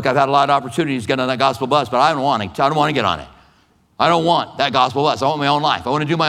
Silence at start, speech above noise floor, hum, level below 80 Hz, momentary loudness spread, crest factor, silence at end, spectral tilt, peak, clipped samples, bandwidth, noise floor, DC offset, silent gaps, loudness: 0 s; 39 dB; none; -52 dBFS; 5 LU; 16 dB; 0 s; -5 dB/octave; 0 dBFS; under 0.1%; 14 kHz; -56 dBFS; under 0.1%; none; -17 LUFS